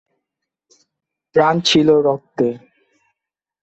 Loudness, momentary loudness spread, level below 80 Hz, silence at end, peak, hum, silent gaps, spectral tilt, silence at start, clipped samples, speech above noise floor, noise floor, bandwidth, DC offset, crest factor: -16 LUFS; 9 LU; -58 dBFS; 1.05 s; -2 dBFS; none; none; -5 dB/octave; 1.35 s; under 0.1%; 70 dB; -85 dBFS; 8.2 kHz; under 0.1%; 16 dB